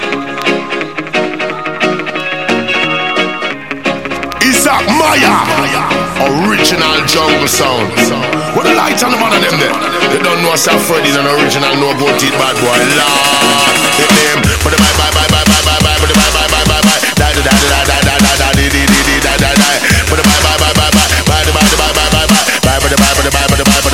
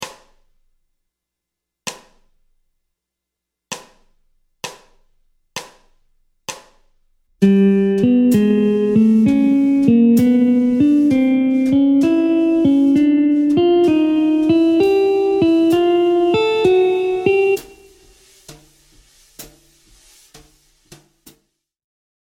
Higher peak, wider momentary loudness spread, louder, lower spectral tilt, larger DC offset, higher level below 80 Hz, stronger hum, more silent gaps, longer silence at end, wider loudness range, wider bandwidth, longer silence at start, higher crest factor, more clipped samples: about the same, 0 dBFS vs 0 dBFS; second, 6 LU vs 19 LU; first, -9 LUFS vs -14 LUFS; second, -3 dB/octave vs -7 dB/octave; first, 1% vs under 0.1%; first, -22 dBFS vs -52 dBFS; neither; neither; second, 0 s vs 2.8 s; second, 4 LU vs 22 LU; about the same, 17.5 kHz vs 16.5 kHz; about the same, 0 s vs 0 s; second, 10 dB vs 16 dB; first, 0.3% vs under 0.1%